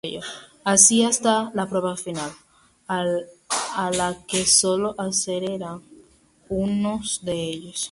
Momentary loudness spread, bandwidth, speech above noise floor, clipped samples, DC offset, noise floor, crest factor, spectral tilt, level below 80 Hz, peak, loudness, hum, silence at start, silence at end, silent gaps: 17 LU; 11.5 kHz; 33 dB; under 0.1%; under 0.1%; -55 dBFS; 24 dB; -2.5 dB/octave; -54 dBFS; 0 dBFS; -21 LUFS; none; 0.05 s; 0 s; none